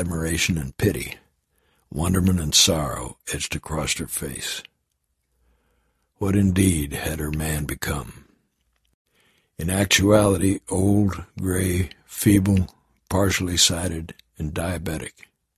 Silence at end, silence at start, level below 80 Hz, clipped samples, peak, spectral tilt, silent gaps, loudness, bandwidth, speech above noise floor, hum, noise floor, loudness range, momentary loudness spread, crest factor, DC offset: 0.5 s; 0 s; -36 dBFS; under 0.1%; -2 dBFS; -4 dB/octave; 8.94-9.05 s; -22 LUFS; 14.5 kHz; 52 dB; none; -74 dBFS; 6 LU; 14 LU; 22 dB; under 0.1%